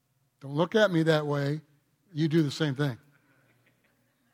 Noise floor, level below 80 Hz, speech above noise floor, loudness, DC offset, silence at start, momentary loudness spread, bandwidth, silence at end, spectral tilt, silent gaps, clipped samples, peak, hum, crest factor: -70 dBFS; -74 dBFS; 43 dB; -27 LUFS; under 0.1%; 0.45 s; 16 LU; 15 kHz; 1.35 s; -6.5 dB/octave; none; under 0.1%; -10 dBFS; none; 20 dB